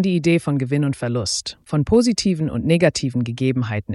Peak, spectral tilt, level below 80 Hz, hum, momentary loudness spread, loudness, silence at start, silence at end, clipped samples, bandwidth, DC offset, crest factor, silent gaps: -4 dBFS; -5.5 dB/octave; -44 dBFS; none; 7 LU; -20 LUFS; 0 s; 0 s; under 0.1%; 12 kHz; under 0.1%; 16 dB; none